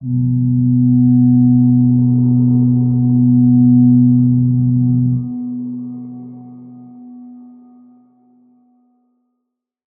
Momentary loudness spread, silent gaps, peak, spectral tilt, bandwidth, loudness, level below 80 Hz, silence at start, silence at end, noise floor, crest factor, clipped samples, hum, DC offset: 15 LU; none; -2 dBFS; -18.5 dB/octave; 1 kHz; -13 LUFS; -48 dBFS; 0 s; 2.55 s; -76 dBFS; 12 dB; under 0.1%; none; under 0.1%